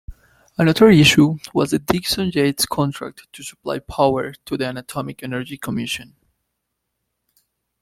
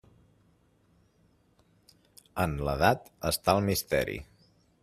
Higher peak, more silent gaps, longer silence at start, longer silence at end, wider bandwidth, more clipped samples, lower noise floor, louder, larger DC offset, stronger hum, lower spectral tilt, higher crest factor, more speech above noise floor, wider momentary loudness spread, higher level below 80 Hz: first, 0 dBFS vs -8 dBFS; neither; second, 0.1 s vs 2.35 s; first, 1.8 s vs 0.6 s; about the same, 16.5 kHz vs 15.5 kHz; neither; first, -76 dBFS vs -67 dBFS; first, -18 LUFS vs -29 LUFS; neither; neither; about the same, -5 dB/octave vs -4.5 dB/octave; second, 18 dB vs 24 dB; first, 58 dB vs 38 dB; first, 18 LU vs 9 LU; about the same, -46 dBFS vs -50 dBFS